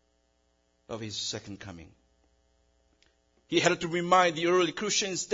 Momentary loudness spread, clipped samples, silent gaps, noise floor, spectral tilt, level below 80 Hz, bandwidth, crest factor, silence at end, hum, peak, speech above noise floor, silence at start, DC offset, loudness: 19 LU; under 0.1%; none; -71 dBFS; -3 dB/octave; -66 dBFS; 7.8 kHz; 22 dB; 0 s; none; -8 dBFS; 43 dB; 0.9 s; under 0.1%; -27 LUFS